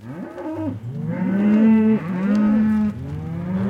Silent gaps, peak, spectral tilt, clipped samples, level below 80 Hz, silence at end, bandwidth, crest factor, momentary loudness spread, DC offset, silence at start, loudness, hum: none; -8 dBFS; -9.5 dB/octave; under 0.1%; -52 dBFS; 0 s; 5 kHz; 12 dB; 15 LU; under 0.1%; 0 s; -20 LUFS; none